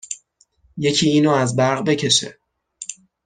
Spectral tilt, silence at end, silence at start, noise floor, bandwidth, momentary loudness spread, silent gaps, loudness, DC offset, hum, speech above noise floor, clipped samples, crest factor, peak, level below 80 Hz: -4 dB/octave; 0.35 s; 0.1 s; -59 dBFS; 10 kHz; 17 LU; none; -17 LUFS; under 0.1%; none; 42 dB; under 0.1%; 18 dB; -4 dBFS; -58 dBFS